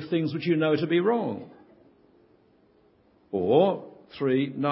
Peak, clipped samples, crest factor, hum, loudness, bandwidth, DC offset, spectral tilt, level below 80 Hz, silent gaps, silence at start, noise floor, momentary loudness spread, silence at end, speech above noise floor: -8 dBFS; under 0.1%; 20 dB; none; -25 LUFS; 5.8 kHz; under 0.1%; -11 dB/octave; -66 dBFS; none; 0 s; -62 dBFS; 13 LU; 0 s; 37 dB